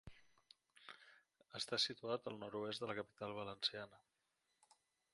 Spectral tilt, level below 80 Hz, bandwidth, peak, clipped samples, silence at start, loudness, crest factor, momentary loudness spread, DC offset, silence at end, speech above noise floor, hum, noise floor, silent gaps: -3 dB/octave; -80 dBFS; 11.5 kHz; -26 dBFS; under 0.1%; 0.05 s; -44 LUFS; 24 dB; 20 LU; under 0.1%; 1.15 s; 40 dB; none; -86 dBFS; none